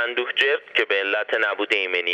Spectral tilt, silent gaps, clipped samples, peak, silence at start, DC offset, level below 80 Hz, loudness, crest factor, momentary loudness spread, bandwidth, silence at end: -1.5 dB/octave; none; under 0.1%; -6 dBFS; 0 s; under 0.1%; -86 dBFS; -21 LUFS; 16 dB; 2 LU; 11 kHz; 0 s